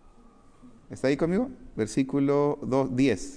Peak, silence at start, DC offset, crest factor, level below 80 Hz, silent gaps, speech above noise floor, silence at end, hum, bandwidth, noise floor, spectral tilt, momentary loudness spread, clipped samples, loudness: -12 dBFS; 0.65 s; under 0.1%; 14 dB; -52 dBFS; none; 28 dB; 0 s; none; 10.5 kHz; -54 dBFS; -6.5 dB/octave; 8 LU; under 0.1%; -27 LUFS